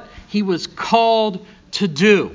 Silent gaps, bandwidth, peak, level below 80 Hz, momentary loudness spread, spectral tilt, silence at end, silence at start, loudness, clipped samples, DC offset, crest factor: none; 7.6 kHz; -2 dBFS; -52 dBFS; 11 LU; -5 dB/octave; 0 s; 0 s; -18 LUFS; under 0.1%; under 0.1%; 16 dB